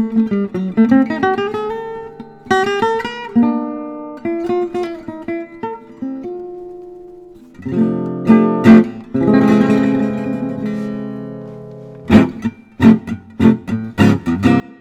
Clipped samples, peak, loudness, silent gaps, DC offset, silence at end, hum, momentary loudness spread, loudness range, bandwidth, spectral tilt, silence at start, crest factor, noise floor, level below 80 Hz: 0.3%; 0 dBFS; -15 LUFS; none; under 0.1%; 0.05 s; none; 18 LU; 11 LU; 8.4 kHz; -7.5 dB/octave; 0 s; 16 dB; -38 dBFS; -44 dBFS